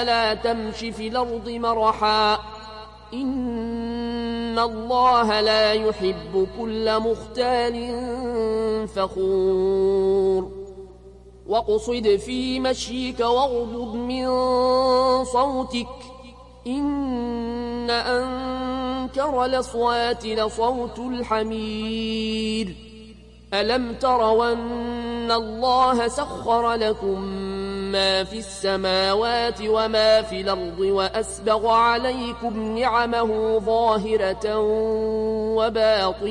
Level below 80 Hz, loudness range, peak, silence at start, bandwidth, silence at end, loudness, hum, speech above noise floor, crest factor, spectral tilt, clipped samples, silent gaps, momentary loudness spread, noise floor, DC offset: -44 dBFS; 3 LU; -6 dBFS; 0 s; 11 kHz; 0 s; -22 LUFS; 60 Hz at -45 dBFS; 23 dB; 16 dB; -4.5 dB/octave; under 0.1%; none; 10 LU; -45 dBFS; under 0.1%